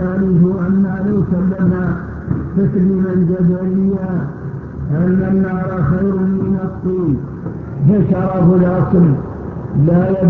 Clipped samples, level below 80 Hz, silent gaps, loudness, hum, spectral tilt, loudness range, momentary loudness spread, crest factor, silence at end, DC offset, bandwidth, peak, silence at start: under 0.1%; -34 dBFS; none; -15 LUFS; none; -12.5 dB/octave; 2 LU; 10 LU; 14 dB; 0 s; under 0.1%; 2.8 kHz; -2 dBFS; 0 s